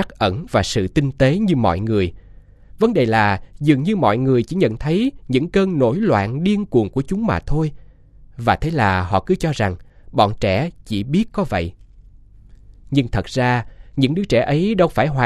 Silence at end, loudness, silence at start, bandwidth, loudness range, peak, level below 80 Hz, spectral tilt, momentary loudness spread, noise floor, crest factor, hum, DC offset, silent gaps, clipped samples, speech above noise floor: 0 s; -19 LUFS; 0 s; 12.5 kHz; 4 LU; 0 dBFS; -36 dBFS; -7 dB/octave; 6 LU; -44 dBFS; 18 dB; none; under 0.1%; none; under 0.1%; 27 dB